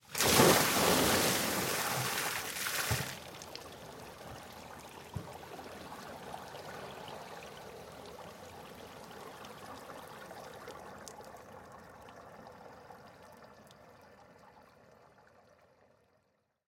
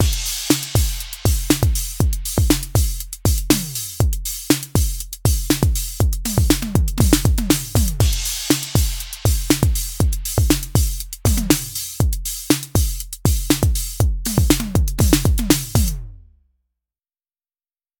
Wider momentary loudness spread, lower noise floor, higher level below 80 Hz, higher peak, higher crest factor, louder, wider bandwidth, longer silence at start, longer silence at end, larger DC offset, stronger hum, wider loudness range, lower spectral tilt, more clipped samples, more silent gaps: first, 25 LU vs 5 LU; second, -77 dBFS vs under -90 dBFS; second, -62 dBFS vs -24 dBFS; second, -10 dBFS vs 0 dBFS; first, 28 dB vs 18 dB; second, -30 LUFS vs -19 LUFS; second, 16.5 kHz vs over 20 kHz; about the same, 0.1 s vs 0 s; first, 2.05 s vs 1.85 s; neither; neither; first, 23 LU vs 2 LU; second, -2.5 dB/octave vs -4.5 dB/octave; neither; neither